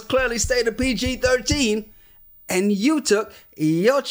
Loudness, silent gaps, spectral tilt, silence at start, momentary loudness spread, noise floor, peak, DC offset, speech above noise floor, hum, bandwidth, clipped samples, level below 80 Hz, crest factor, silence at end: -21 LUFS; none; -4 dB/octave; 0 s; 6 LU; -49 dBFS; -6 dBFS; under 0.1%; 29 dB; none; 16.5 kHz; under 0.1%; -40 dBFS; 16 dB; 0 s